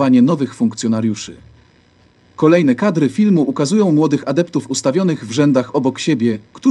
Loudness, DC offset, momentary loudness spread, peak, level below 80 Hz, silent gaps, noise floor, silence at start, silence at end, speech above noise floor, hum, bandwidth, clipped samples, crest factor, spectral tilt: -15 LUFS; under 0.1%; 6 LU; 0 dBFS; -58 dBFS; none; -51 dBFS; 0 s; 0 s; 37 dB; none; 11 kHz; under 0.1%; 14 dB; -6 dB/octave